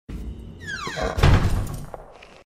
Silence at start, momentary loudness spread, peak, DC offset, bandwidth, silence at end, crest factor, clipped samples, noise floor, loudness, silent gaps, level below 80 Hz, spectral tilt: 0.1 s; 19 LU; -2 dBFS; under 0.1%; 15.5 kHz; 0.2 s; 22 dB; under 0.1%; -42 dBFS; -23 LUFS; none; -28 dBFS; -6 dB/octave